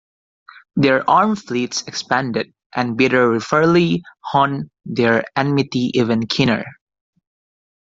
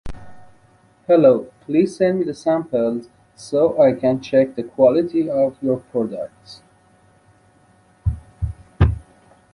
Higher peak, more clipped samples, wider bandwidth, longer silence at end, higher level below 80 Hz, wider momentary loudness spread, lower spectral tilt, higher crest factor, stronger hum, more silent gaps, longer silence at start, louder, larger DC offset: about the same, -2 dBFS vs -2 dBFS; neither; second, 7.8 kHz vs 11 kHz; first, 1.2 s vs 0.55 s; second, -56 dBFS vs -34 dBFS; second, 10 LU vs 15 LU; second, -5.5 dB/octave vs -8 dB/octave; about the same, 16 dB vs 18 dB; neither; first, 2.66-2.70 s vs none; first, 0.75 s vs 0.05 s; about the same, -18 LUFS vs -19 LUFS; neither